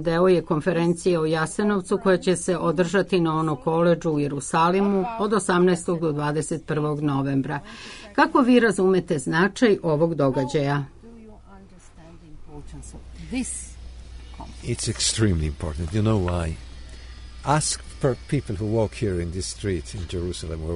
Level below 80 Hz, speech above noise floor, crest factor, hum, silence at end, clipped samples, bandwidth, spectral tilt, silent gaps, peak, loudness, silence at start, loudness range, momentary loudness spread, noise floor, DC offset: -40 dBFS; 23 dB; 20 dB; none; 0 s; under 0.1%; 11 kHz; -5.5 dB/octave; none; -4 dBFS; -23 LUFS; 0 s; 9 LU; 19 LU; -46 dBFS; under 0.1%